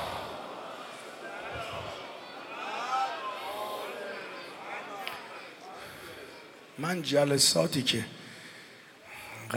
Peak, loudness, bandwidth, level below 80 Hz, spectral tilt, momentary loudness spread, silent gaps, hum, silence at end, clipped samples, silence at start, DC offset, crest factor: -10 dBFS; -32 LUFS; 17.5 kHz; -68 dBFS; -3 dB/octave; 19 LU; none; none; 0 s; under 0.1%; 0 s; under 0.1%; 24 dB